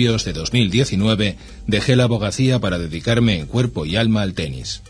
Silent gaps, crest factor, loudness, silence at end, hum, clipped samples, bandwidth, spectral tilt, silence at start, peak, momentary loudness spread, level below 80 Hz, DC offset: none; 18 dB; -19 LUFS; 0 s; none; under 0.1%; 10.5 kHz; -5.5 dB/octave; 0 s; 0 dBFS; 7 LU; -36 dBFS; under 0.1%